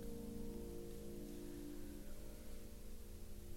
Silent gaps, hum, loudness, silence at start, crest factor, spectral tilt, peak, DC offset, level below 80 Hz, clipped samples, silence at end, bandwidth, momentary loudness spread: none; none; -53 LUFS; 0 s; 12 dB; -6 dB/octave; -36 dBFS; under 0.1%; -54 dBFS; under 0.1%; 0 s; 16 kHz; 7 LU